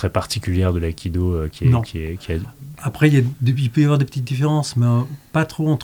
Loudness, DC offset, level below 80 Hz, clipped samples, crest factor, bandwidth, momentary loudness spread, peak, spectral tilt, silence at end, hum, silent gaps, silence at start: -20 LUFS; under 0.1%; -40 dBFS; under 0.1%; 16 dB; 20 kHz; 11 LU; -2 dBFS; -7 dB/octave; 0 s; none; none; 0 s